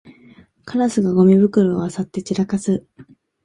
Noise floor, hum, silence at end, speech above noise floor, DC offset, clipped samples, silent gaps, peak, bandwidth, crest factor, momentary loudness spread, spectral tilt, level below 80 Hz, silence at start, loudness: -48 dBFS; none; 0.4 s; 31 dB; under 0.1%; under 0.1%; none; -4 dBFS; 10.5 kHz; 16 dB; 12 LU; -7.5 dB/octave; -56 dBFS; 0.65 s; -18 LUFS